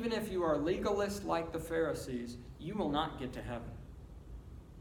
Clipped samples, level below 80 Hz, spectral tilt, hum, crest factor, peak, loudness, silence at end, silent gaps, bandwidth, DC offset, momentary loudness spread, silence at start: under 0.1%; -52 dBFS; -5.5 dB/octave; none; 18 dB; -18 dBFS; -37 LUFS; 0 s; none; 19 kHz; under 0.1%; 19 LU; 0 s